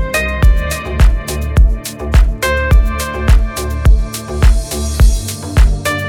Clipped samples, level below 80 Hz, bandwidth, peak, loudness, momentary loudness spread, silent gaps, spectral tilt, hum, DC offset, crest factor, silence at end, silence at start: under 0.1%; -12 dBFS; 16.5 kHz; 0 dBFS; -14 LUFS; 6 LU; none; -5 dB/octave; none; under 0.1%; 10 dB; 0 s; 0 s